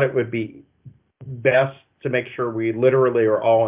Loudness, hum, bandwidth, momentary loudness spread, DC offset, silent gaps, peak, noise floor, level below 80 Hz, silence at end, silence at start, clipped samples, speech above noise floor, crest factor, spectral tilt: -20 LUFS; none; 3.8 kHz; 12 LU; under 0.1%; none; -4 dBFS; -48 dBFS; -62 dBFS; 0 s; 0 s; under 0.1%; 29 dB; 18 dB; -11 dB/octave